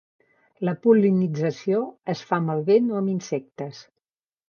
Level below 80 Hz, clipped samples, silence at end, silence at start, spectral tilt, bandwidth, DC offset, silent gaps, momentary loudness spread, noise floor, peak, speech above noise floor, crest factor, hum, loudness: -74 dBFS; under 0.1%; 0.7 s; 0.6 s; -7.5 dB/octave; 7 kHz; under 0.1%; none; 13 LU; -84 dBFS; -6 dBFS; 62 dB; 18 dB; none; -23 LUFS